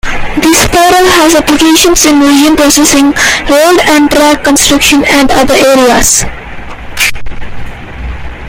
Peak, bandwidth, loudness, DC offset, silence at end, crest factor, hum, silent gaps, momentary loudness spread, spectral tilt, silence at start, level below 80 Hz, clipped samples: 0 dBFS; over 20 kHz; -5 LUFS; under 0.1%; 0 s; 6 dB; none; none; 20 LU; -2.5 dB/octave; 0.05 s; -22 dBFS; 1%